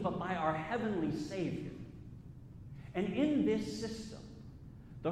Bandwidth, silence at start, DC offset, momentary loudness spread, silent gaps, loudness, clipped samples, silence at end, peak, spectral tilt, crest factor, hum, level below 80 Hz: 12.5 kHz; 0 s; under 0.1%; 20 LU; none; -36 LUFS; under 0.1%; 0 s; -20 dBFS; -6.5 dB/octave; 18 dB; none; -58 dBFS